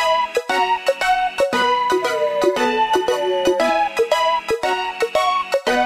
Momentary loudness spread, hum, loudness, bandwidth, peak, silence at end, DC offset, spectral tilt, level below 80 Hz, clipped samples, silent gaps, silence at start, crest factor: 3 LU; none; -18 LUFS; 15.5 kHz; -4 dBFS; 0 s; under 0.1%; -2.5 dB/octave; -52 dBFS; under 0.1%; none; 0 s; 14 dB